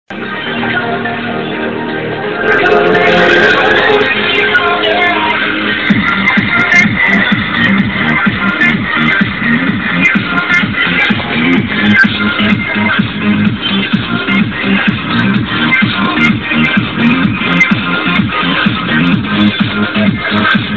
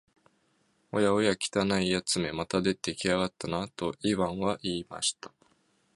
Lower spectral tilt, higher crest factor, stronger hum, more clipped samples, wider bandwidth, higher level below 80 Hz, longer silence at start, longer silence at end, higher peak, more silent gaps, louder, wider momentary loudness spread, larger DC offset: first, -6 dB/octave vs -4 dB/octave; second, 10 dB vs 20 dB; neither; neither; second, 7.6 kHz vs 11.5 kHz; first, -36 dBFS vs -58 dBFS; second, 0.1 s vs 0.95 s; second, 0 s vs 0.7 s; first, 0 dBFS vs -10 dBFS; neither; first, -10 LUFS vs -29 LUFS; about the same, 6 LU vs 8 LU; first, 0.9% vs under 0.1%